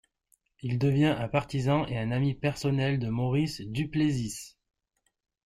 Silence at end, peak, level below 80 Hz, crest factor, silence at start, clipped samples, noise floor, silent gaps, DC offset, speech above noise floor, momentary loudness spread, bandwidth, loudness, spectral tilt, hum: 0.95 s; -12 dBFS; -54 dBFS; 18 dB; 0.65 s; under 0.1%; -78 dBFS; none; under 0.1%; 50 dB; 8 LU; 12.5 kHz; -29 LUFS; -6.5 dB/octave; none